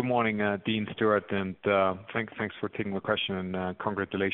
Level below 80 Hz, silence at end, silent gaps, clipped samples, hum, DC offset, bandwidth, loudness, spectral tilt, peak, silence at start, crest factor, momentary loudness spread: -64 dBFS; 0 s; none; under 0.1%; none; under 0.1%; 4 kHz; -29 LUFS; -4 dB/octave; -12 dBFS; 0 s; 18 dB; 7 LU